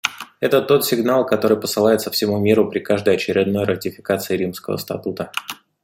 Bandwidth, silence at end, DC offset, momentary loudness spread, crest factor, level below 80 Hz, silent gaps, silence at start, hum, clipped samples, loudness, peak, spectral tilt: 16.5 kHz; 0.3 s; under 0.1%; 10 LU; 18 dB; -60 dBFS; none; 0.05 s; none; under 0.1%; -19 LUFS; 0 dBFS; -5 dB/octave